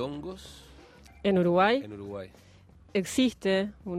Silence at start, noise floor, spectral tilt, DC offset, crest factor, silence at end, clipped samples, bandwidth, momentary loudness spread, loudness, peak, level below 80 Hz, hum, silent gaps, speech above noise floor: 0 s; -52 dBFS; -5.5 dB/octave; under 0.1%; 18 dB; 0 s; under 0.1%; 15.5 kHz; 19 LU; -27 LUFS; -10 dBFS; -58 dBFS; none; none; 25 dB